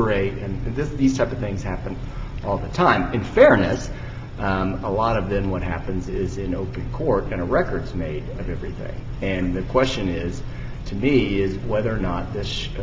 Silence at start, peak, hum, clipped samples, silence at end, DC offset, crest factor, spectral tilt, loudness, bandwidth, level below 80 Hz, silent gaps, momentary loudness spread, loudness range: 0 s; 0 dBFS; none; under 0.1%; 0 s; under 0.1%; 22 dB; -6.5 dB/octave; -23 LUFS; 7.8 kHz; -32 dBFS; none; 13 LU; 6 LU